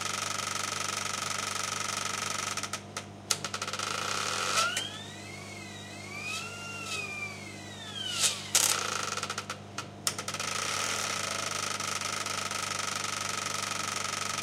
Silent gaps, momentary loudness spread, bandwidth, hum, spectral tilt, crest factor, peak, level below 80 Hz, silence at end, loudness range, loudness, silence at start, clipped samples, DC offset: none; 14 LU; 17 kHz; 50 Hz at -50 dBFS; -1 dB/octave; 28 dB; -6 dBFS; -70 dBFS; 0 s; 4 LU; -31 LUFS; 0 s; under 0.1%; under 0.1%